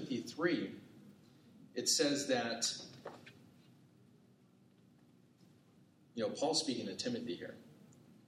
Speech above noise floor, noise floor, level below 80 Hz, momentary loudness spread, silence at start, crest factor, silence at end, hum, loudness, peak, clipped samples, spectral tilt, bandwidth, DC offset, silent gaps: 30 dB; -67 dBFS; -86 dBFS; 22 LU; 0 s; 22 dB; 0.15 s; none; -37 LUFS; -18 dBFS; under 0.1%; -2.5 dB/octave; 16 kHz; under 0.1%; none